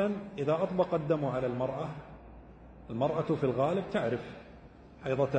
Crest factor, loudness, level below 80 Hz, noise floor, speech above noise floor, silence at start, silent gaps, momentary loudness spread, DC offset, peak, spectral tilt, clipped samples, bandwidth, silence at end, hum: 18 dB; -32 LUFS; -58 dBFS; -52 dBFS; 21 dB; 0 s; none; 21 LU; under 0.1%; -14 dBFS; -8.5 dB/octave; under 0.1%; 9 kHz; 0 s; none